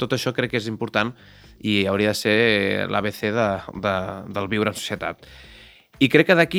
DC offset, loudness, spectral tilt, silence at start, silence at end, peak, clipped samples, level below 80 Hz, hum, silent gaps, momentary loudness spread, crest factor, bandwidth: under 0.1%; -22 LUFS; -5 dB/octave; 0 s; 0 s; 0 dBFS; under 0.1%; -54 dBFS; none; none; 12 LU; 22 dB; over 20 kHz